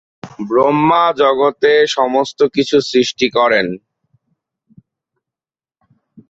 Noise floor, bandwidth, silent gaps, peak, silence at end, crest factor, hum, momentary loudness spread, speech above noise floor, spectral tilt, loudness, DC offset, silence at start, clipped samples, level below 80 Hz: under -90 dBFS; 8 kHz; none; 0 dBFS; 2.5 s; 14 dB; none; 5 LU; over 77 dB; -4.5 dB/octave; -14 LUFS; under 0.1%; 0.25 s; under 0.1%; -58 dBFS